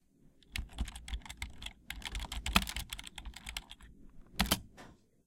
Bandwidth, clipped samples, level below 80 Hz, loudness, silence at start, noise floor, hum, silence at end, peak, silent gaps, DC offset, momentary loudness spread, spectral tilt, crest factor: 17 kHz; under 0.1%; -46 dBFS; -38 LUFS; 0.25 s; -64 dBFS; none; 0.3 s; -8 dBFS; none; under 0.1%; 20 LU; -2.5 dB/octave; 32 dB